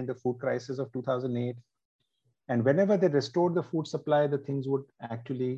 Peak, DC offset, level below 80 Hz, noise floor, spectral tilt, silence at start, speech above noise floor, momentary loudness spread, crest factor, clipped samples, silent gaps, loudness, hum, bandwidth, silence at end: -12 dBFS; under 0.1%; -74 dBFS; -69 dBFS; -7.5 dB/octave; 0 s; 41 dB; 11 LU; 18 dB; under 0.1%; 1.85-1.99 s; -29 LUFS; none; 8 kHz; 0 s